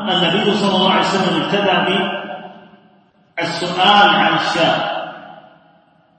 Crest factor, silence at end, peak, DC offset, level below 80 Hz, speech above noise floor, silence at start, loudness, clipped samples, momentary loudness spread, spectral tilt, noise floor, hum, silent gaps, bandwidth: 18 dB; 0.8 s; 0 dBFS; under 0.1%; -60 dBFS; 38 dB; 0 s; -15 LUFS; under 0.1%; 17 LU; -4.5 dB/octave; -53 dBFS; none; none; 8.8 kHz